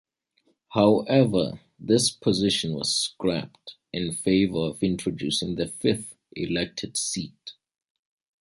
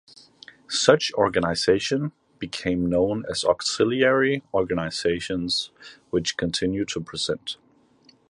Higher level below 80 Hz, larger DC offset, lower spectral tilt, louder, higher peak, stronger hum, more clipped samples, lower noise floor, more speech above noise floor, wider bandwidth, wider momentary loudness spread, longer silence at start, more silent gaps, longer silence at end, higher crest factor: about the same, -54 dBFS vs -50 dBFS; neither; about the same, -4.5 dB/octave vs -4 dB/octave; about the same, -25 LUFS vs -23 LUFS; second, -6 dBFS vs -2 dBFS; neither; neither; first, -69 dBFS vs -58 dBFS; first, 45 dB vs 34 dB; about the same, 11.5 kHz vs 11.5 kHz; first, 14 LU vs 10 LU; about the same, 0.7 s vs 0.7 s; neither; first, 0.9 s vs 0.75 s; about the same, 20 dB vs 24 dB